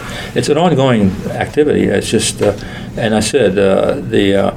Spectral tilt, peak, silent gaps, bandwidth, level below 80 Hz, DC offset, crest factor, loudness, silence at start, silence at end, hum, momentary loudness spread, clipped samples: -5 dB/octave; 0 dBFS; none; 16 kHz; -36 dBFS; under 0.1%; 14 dB; -13 LUFS; 0 s; 0 s; none; 8 LU; under 0.1%